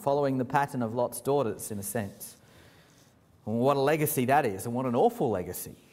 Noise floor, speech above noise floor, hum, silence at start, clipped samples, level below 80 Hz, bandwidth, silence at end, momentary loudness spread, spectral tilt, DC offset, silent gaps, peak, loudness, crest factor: -60 dBFS; 32 dB; none; 0 s; under 0.1%; -64 dBFS; 16 kHz; 0.2 s; 13 LU; -5.5 dB/octave; under 0.1%; none; -10 dBFS; -28 LUFS; 20 dB